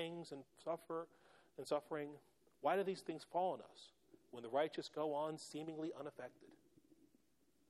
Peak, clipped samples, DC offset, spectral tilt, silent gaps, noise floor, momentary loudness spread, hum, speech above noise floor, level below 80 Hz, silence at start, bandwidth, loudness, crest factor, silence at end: -24 dBFS; under 0.1%; under 0.1%; -5 dB/octave; none; -79 dBFS; 17 LU; none; 35 dB; under -90 dBFS; 0 s; 14 kHz; -45 LUFS; 20 dB; 1.15 s